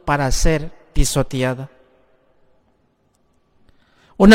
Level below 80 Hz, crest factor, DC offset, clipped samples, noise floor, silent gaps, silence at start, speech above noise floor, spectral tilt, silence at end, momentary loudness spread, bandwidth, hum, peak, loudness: -26 dBFS; 18 dB; under 0.1%; under 0.1%; -62 dBFS; none; 0.05 s; 45 dB; -5 dB/octave; 0 s; 14 LU; 16.5 kHz; none; 0 dBFS; -20 LUFS